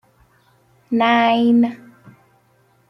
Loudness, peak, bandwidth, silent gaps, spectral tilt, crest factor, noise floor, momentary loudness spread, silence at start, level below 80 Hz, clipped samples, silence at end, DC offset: -16 LUFS; -4 dBFS; 6 kHz; none; -6.5 dB/octave; 16 dB; -58 dBFS; 8 LU; 0.9 s; -66 dBFS; under 0.1%; 1.15 s; under 0.1%